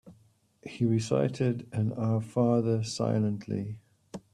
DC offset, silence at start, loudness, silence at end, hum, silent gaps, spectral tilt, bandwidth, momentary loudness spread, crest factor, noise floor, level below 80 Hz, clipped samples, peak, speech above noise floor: under 0.1%; 0.05 s; -29 LUFS; 0.15 s; none; none; -7 dB/octave; 10.5 kHz; 20 LU; 18 dB; -64 dBFS; -66 dBFS; under 0.1%; -12 dBFS; 36 dB